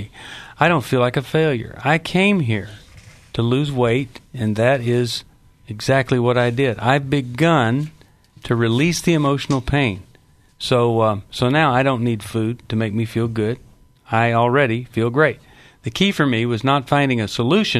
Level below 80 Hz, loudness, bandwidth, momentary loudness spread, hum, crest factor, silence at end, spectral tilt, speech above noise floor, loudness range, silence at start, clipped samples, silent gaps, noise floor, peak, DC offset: -46 dBFS; -19 LUFS; 13.5 kHz; 10 LU; none; 18 dB; 0 s; -6 dB/octave; 34 dB; 2 LU; 0 s; under 0.1%; none; -52 dBFS; 0 dBFS; under 0.1%